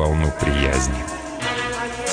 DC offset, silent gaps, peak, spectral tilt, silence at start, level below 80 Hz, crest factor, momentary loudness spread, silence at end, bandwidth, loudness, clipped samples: under 0.1%; none; -6 dBFS; -4.5 dB/octave; 0 s; -26 dBFS; 14 dB; 7 LU; 0 s; 10 kHz; -22 LUFS; under 0.1%